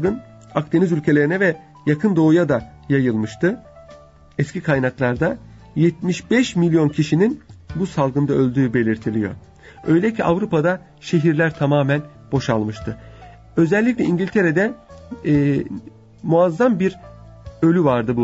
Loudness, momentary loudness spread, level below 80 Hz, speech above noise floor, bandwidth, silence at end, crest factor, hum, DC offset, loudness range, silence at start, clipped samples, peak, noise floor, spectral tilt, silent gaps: -19 LUFS; 12 LU; -48 dBFS; 27 dB; 8 kHz; 0 s; 14 dB; none; under 0.1%; 2 LU; 0 s; under 0.1%; -4 dBFS; -45 dBFS; -7.5 dB/octave; none